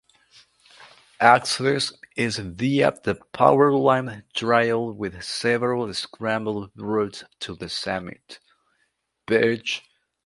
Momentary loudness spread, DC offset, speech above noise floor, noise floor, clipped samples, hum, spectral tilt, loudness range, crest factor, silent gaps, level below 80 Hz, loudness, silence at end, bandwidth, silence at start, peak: 14 LU; under 0.1%; 49 dB; -72 dBFS; under 0.1%; none; -4.5 dB/octave; 8 LU; 24 dB; none; -58 dBFS; -23 LUFS; 0.45 s; 11.5 kHz; 0.8 s; 0 dBFS